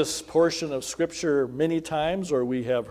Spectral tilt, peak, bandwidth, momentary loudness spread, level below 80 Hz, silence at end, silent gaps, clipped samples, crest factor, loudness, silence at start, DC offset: -4.5 dB/octave; -10 dBFS; 16 kHz; 5 LU; -56 dBFS; 0 s; none; under 0.1%; 16 dB; -26 LUFS; 0 s; under 0.1%